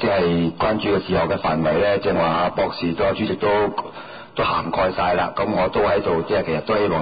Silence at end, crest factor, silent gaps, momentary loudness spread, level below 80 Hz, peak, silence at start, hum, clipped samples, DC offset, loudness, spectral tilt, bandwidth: 0 s; 10 dB; none; 4 LU; -42 dBFS; -10 dBFS; 0 s; none; under 0.1%; 0.3%; -20 LUFS; -11 dB/octave; 5 kHz